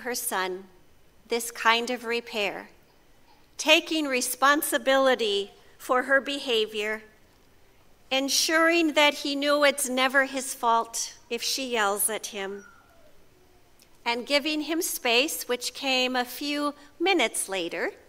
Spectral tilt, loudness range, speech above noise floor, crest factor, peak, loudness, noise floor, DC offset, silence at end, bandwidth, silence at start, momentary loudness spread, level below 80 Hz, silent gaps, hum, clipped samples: -0.5 dB/octave; 6 LU; 31 dB; 24 dB; -4 dBFS; -25 LUFS; -57 dBFS; under 0.1%; 0.15 s; 16 kHz; 0 s; 11 LU; -64 dBFS; none; none; under 0.1%